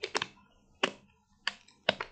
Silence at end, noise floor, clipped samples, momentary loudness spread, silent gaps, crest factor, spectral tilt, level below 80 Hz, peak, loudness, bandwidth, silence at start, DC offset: 0 s; -65 dBFS; under 0.1%; 7 LU; none; 30 dB; -2 dB/octave; -70 dBFS; -6 dBFS; -35 LUFS; 9 kHz; 0 s; under 0.1%